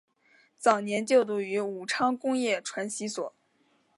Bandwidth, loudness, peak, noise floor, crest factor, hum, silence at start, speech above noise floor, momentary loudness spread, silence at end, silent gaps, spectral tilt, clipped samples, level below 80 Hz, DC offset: 11.5 kHz; -28 LUFS; -8 dBFS; -69 dBFS; 22 dB; none; 0.6 s; 41 dB; 9 LU; 0.7 s; none; -3.5 dB/octave; under 0.1%; -80 dBFS; under 0.1%